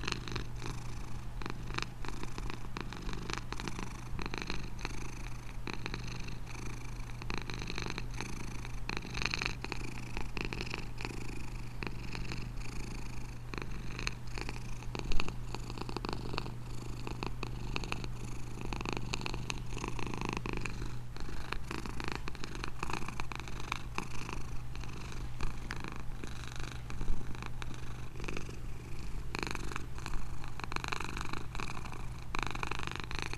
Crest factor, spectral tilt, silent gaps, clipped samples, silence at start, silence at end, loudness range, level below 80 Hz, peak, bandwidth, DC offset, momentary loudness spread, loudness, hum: 24 dB; -4.5 dB/octave; none; under 0.1%; 0 s; 0 s; 4 LU; -44 dBFS; -10 dBFS; 13.5 kHz; under 0.1%; 6 LU; -41 LUFS; none